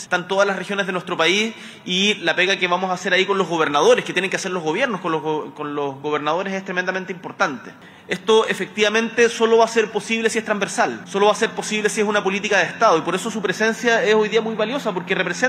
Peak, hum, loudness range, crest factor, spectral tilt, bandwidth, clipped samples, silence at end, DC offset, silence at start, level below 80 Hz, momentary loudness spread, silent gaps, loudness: -2 dBFS; none; 4 LU; 16 dB; -3.5 dB/octave; 14 kHz; under 0.1%; 0 s; under 0.1%; 0 s; -70 dBFS; 8 LU; none; -19 LUFS